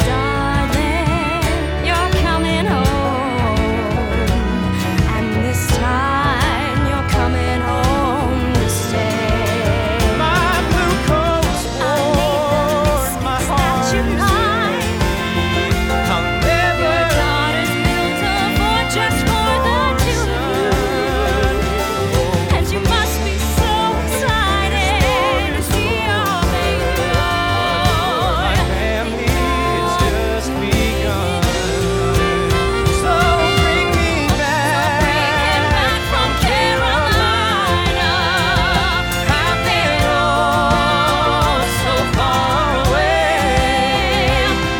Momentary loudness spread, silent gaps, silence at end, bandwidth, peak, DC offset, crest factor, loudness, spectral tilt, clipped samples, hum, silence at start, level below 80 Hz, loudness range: 4 LU; none; 0 s; over 20 kHz; -2 dBFS; under 0.1%; 14 dB; -16 LUFS; -4.5 dB/octave; under 0.1%; none; 0 s; -24 dBFS; 2 LU